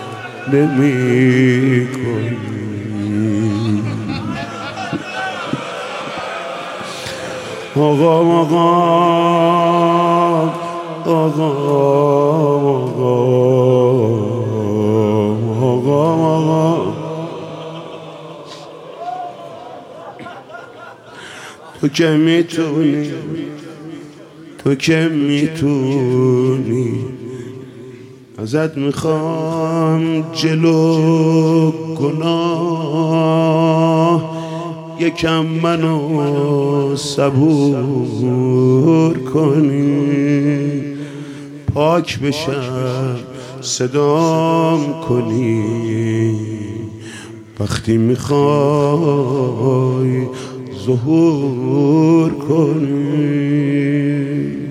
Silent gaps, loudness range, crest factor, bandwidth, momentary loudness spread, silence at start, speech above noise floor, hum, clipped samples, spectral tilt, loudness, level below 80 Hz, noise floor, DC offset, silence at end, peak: none; 7 LU; 14 dB; 13 kHz; 17 LU; 0 s; 23 dB; none; under 0.1%; -7 dB/octave; -15 LUFS; -52 dBFS; -37 dBFS; under 0.1%; 0 s; 0 dBFS